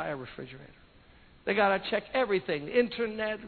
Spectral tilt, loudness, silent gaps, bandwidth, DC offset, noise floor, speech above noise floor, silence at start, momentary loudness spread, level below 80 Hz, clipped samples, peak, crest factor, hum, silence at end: -8.5 dB/octave; -29 LUFS; none; 4.6 kHz; under 0.1%; -57 dBFS; 27 dB; 0 s; 17 LU; -60 dBFS; under 0.1%; -10 dBFS; 20 dB; none; 0 s